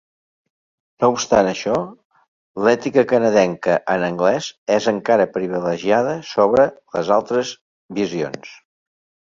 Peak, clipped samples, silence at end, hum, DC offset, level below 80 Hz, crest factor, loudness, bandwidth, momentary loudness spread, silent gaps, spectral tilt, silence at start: -2 dBFS; under 0.1%; 0.85 s; none; under 0.1%; -58 dBFS; 18 dB; -18 LUFS; 7.6 kHz; 10 LU; 2.05-2.10 s, 2.28-2.54 s, 4.58-4.66 s, 7.61-7.89 s; -5 dB/octave; 1 s